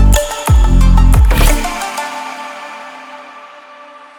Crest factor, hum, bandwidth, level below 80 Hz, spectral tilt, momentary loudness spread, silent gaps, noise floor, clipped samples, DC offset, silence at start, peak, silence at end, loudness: 12 dB; none; over 20 kHz; -12 dBFS; -5 dB/octave; 22 LU; none; -36 dBFS; under 0.1%; under 0.1%; 0 s; 0 dBFS; 0.75 s; -13 LUFS